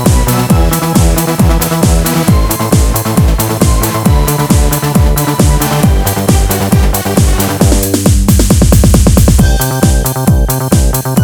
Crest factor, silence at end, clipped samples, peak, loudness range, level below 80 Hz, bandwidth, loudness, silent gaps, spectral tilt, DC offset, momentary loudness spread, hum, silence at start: 8 dB; 0 s; 2%; 0 dBFS; 2 LU; -12 dBFS; over 20 kHz; -10 LUFS; none; -5.5 dB/octave; under 0.1%; 3 LU; none; 0 s